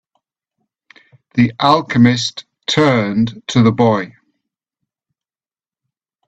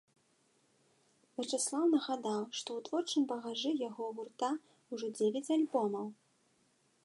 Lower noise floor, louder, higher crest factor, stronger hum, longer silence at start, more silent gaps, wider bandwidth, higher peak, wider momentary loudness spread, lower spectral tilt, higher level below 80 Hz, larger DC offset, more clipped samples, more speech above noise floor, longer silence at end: first, under -90 dBFS vs -73 dBFS; first, -15 LUFS vs -36 LUFS; about the same, 18 dB vs 18 dB; neither; about the same, 1.35 s vs 1.4 s; neither; second, 8 kHz vs 11.5 kHz; first, 0 dBFS vs -20 dBFS; about the same, 10 LU vs 11 LU; first, -6 dB/octave vs -3.5 dB/octave; first, -54 dBFS vs under -90 dBFS; neither; neither; first, over 76 dB vs 38 dB; first, 2.2 s vs 0.9 s